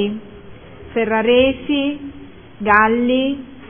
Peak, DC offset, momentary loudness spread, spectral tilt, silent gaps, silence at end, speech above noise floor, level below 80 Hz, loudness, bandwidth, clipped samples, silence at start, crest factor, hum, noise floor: 0 dBFS; 0.5%; 14 LU; -8.5 dB/octave; none; 0 s; 22 dB; -44 dBFS; -17 LUFS; 3.6 kHz; under 0.1%; 0 s; 18 dB; none; -38 dBFS